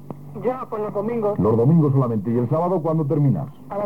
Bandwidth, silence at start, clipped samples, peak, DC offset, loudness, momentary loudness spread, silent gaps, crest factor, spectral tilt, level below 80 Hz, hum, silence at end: 3.3 kHz; 0 s; under 0.1%; -6 dBFS; 0.6%; -21 LUFS; 10 LU; none; 14 dB; -11.5 dB/octave; -60 dBFS; none; 0 s